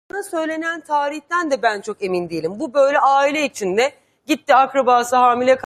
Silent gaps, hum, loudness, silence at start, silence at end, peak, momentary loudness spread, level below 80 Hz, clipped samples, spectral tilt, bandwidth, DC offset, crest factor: none; none; -18 LUFS; 0.15 s; 0.05 s; -2 dBFS; 9 LU; -66 dBFS; under 0.1%; -3.5 dB/octave; 15 kHz; under 0.1%; 16 dB